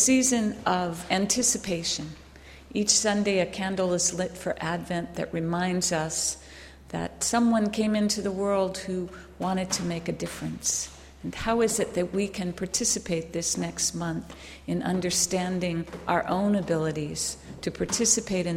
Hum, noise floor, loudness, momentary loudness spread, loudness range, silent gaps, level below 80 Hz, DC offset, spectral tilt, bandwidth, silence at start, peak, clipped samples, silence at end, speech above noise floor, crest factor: none; -48 dBFS; -27 LUFS; 11 LU; 3 LU; none; -52 dBFS; under 0.1%; -3.5 dB/octave; 16 kHz; 0 s; -6 dBFS; under 0.1%; 0 s; 21 dB; 20 dB